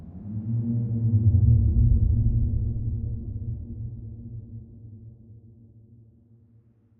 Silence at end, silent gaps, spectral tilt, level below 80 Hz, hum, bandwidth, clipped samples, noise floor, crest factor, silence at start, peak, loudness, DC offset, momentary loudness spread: 1.65 s; none; -17 dB/octave; -32 dBFS; none; 1 kHz; under 0.1%; -58 dBFS; 16 dB; 0 s; -10 dBFS; -25 LUFS; under 0.1%; 23 LU